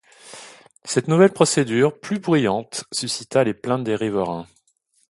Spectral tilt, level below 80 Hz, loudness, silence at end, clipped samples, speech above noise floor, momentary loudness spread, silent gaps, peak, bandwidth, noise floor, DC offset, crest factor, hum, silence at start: -5 dB/octave; -60 dBFS; -20 LUFS; 0.65 s; under 0.1%; 45 dB; 22 LU; none; 0 dBFS; 11.5 kHz; -65 dBFS; under 0.1%; 20 dB; none; 0.25 s